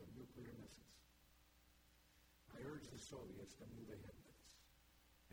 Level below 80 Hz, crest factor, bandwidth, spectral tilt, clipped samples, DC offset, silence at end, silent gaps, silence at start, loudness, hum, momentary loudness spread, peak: -74 dBFS; 18 dB; 17.5 kHz; -5 dB/octave; under 0.1%; under 0.1%; 0 s; none; 0 s; -58 LUFS; none; 12 LU; -42 dBFS